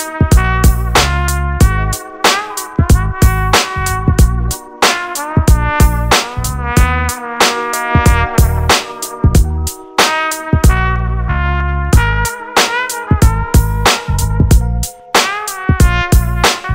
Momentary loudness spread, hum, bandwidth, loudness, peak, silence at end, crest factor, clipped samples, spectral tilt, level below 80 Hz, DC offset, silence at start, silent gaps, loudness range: 6 LU; none; 16.5 kHz; -13 LUFS; 0 dBFS; 0 s; 12 dB; under 0.1%; -4 dB/octave; -16 dBFS; 0.3%; 0 s; none; 1 LU